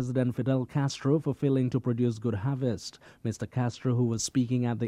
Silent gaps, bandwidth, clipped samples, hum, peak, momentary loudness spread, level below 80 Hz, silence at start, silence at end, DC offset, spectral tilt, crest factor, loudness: none; 12 kHz; under 0.1%; none; -14 dBFS; 7 LU; -62 dBFS; 0 s; 0 s; under 0.1%; -6.5 dB/octave; 16 dB; -29 LUFS